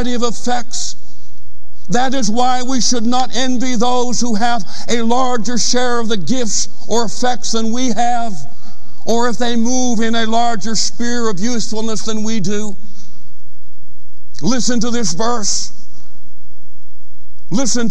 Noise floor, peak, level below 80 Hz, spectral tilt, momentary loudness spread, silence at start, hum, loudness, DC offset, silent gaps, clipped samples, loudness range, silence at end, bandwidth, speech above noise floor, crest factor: -40 dBFS; 0 dBFS; -46 dBFS; -3.5 dB/octave; 6 LU; 0 s; 60 Hz at -50 dBFS; -18 LUFS; 40%; none; under 0.1%; 5 LU; 0 s; 11.5 kHz; 22 dB; 14 dB